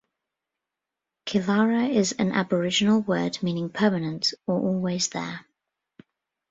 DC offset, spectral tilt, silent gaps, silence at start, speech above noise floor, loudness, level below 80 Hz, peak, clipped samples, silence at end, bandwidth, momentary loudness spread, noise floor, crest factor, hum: under 0.1%; -4.5 dB/octave; none; 1.25 s; 63 dB; -24 LUFS; -64 dBFS; -8 dBFS; under 0.1%; 1.1 s; 8 kHz; 7 LU; -87 dBFS; 18 dB; none